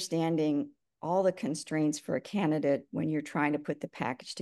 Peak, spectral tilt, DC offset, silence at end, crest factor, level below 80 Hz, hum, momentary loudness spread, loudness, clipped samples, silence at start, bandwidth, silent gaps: -14 dBFS; -5.5 dB/octave; under 0.1%; 0 s; 16 dB; -76 dBFS; none; 7 LU; -31 LUFS; under 0.1%; 0 s; 12.5 kHz; none